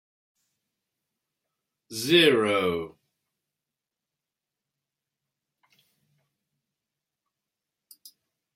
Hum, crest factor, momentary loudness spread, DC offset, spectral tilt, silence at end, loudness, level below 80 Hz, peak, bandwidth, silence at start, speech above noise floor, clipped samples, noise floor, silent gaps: none; 24 dB; 19 LU; under 0.1%; -4 dB/octave; 5.65 s; -22 LUFS; -74 dBFS; -6 dBFS; 16 kHz; 1.9 s; 66 dB; under 0.1%; -88 dBFS; none